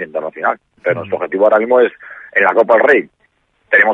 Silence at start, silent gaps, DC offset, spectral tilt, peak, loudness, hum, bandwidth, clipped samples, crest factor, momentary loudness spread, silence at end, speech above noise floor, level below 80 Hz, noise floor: 0 s; none; under 0.1%; -7 dB/octave; 0 dBFS; -14 LUFS; none; 6.6 kHz; under 0.1%; 14 dB; 10 LU; 0 s; 46 dB; -62 dBFS; -60 dBFS